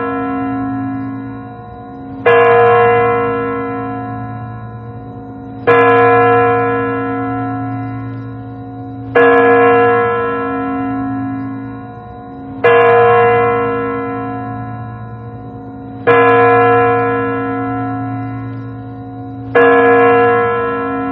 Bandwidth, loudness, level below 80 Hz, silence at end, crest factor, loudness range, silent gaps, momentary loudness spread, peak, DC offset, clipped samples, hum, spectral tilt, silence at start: 4.1 kHz; -12 LUFS; -44 dBFS; 0 s; 14 dB; 3 LU; none; 20 LU; 0 dBFS; under 0.1%; under 0.1%; none; -9 dB/octave; 0 s